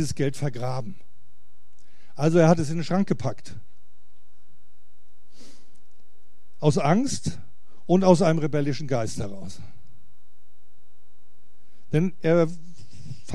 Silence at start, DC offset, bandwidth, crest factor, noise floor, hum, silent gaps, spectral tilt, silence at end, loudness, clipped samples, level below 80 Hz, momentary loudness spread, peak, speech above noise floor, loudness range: 0 s; 4%; 12 kHz; 24 dB; -66 dBFS; none; none; -6.5 dB/octave; 0 s; -24 LUFS; under 0.1%; -58 dBFS; 24 LU; -2 dBFS; 43 dB; 10 LU